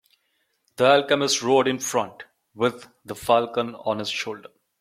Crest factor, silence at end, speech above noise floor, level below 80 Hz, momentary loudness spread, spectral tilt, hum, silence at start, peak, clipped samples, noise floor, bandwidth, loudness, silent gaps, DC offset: 20 dB; 0.4 s; 49 dB; -66 dBFS; 15 LU; -3 dB/octave; none; 0.8 s; -4 dBFS; under 0.1%; -71 dBFS; 16 kHz; -22 LUFS; none; under 0.1%